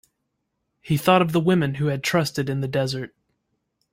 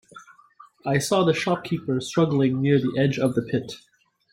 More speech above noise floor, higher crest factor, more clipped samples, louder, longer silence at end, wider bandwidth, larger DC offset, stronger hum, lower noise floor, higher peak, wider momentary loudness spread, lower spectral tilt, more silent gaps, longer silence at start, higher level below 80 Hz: first, 55 dB vs 30 dB; about the same, 20 dB vs 16 dB; neither; about the same, -22 LUFS vs -23 LUFS; first, 0.85 s vs 0.55 s; about the same, 16.5 kHz vs 16 kHz; neither; neither; first, -77 dBFS vs -53 dBFS; first, -2 dBFS vs -8 dBFS; about the same, 9 LU vs 8 LU; about the same, -6 dB/octave vs -6 dB/octave; neither; first, 0.85 s vs 0.15 s; about the same, -58 dBFS vs -60 dBFS